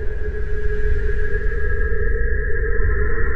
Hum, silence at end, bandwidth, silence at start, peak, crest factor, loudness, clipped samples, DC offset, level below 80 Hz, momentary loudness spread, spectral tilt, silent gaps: none; 0 s; 3.1 kHz; 0 s; -4 dBFS; 12 dB; -24 LUFS; under 0.1%; under 0.1%; -20 dBFS; 5 LU; -9 dB/octave; none